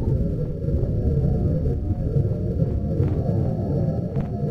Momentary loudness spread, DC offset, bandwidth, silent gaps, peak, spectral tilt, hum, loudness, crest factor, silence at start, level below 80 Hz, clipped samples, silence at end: 4 LU; 0.5%; 5.8 kHz; none; -8 dBFS; -11.5 dB/octave; none; -24 LUFS; 14 dB; 0 s; -30 dBFS; under 0.1%; 0 s